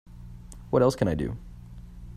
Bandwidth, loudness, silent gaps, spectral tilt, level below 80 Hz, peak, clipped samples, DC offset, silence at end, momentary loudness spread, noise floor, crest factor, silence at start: 14.5 kHz; -26 LUFS; none; -7 dB/octave; -44 dBFS; -8 dBFS; under 0.1%; under 0.1%; 0 s; 23 LU; -43 dBFS; 20 dB; 0.1 s